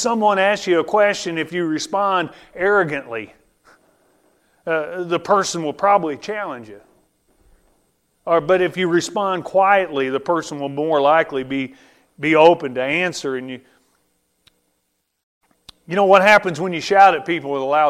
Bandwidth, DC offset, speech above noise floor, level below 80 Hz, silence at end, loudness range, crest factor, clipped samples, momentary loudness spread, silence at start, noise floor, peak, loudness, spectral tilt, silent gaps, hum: 14 kHz; under 0.1%; 53 dB; -60 dBFS; 0 s; 6 LU; 20 dB; under 0.1%; 14 LU; 0 s; -71 dBFS; 0 dBFS; -18 LUFS; -4.5 dB/octave; 15.23-15.41 s; none